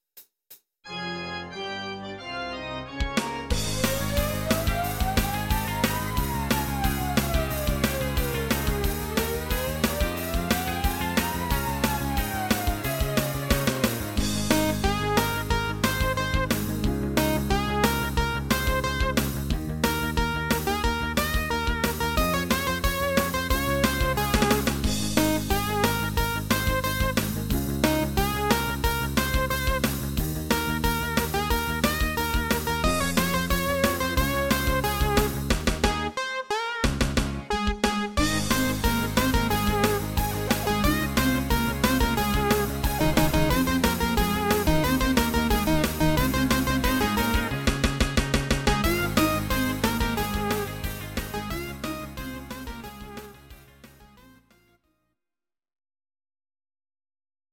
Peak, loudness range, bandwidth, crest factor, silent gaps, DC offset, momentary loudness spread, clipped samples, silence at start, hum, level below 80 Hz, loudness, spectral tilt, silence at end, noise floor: -8 dBFS; 5 LU; 17 kHz; 18 dB; none; under 0.1%; 6 LU; under 0.1%; 0.15 s; none; -32 dBFS; -25 LUFS; -4.5 dB/octave; 3.45 s; under -90 dBFS